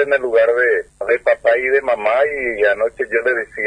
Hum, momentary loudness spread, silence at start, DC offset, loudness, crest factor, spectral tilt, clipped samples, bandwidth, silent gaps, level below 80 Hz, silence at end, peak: none; 5 LU; 0 s; under 0.1%; -16 LUFS; 14 dB; -4.5 dB/octave; under 0.1%; 10 kHz; none; -52 dBFS; 0 s; -2 dBFS